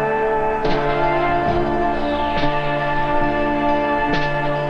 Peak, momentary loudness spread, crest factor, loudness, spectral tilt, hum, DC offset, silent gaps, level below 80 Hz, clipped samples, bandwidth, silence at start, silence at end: -6 dBFS; 2 LU; 12 dB; -19 LUFS; -7 dB/octave; none; under 0.1%; none; -30 dBFS; under 0.1%; 6.8 kHz; 0 s; 0 s